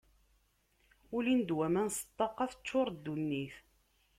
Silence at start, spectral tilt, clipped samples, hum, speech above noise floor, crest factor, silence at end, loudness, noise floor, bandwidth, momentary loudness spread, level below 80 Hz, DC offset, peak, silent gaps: 1.1 s; -5 dB/octave; under 0.1%; none; 39 dB; 18 dB; 0.6 s; -35 LUFS; -73 dBFS; 16 kHz; 8 LU; -68 dBFS; under 0.1%; -20 dBFS; none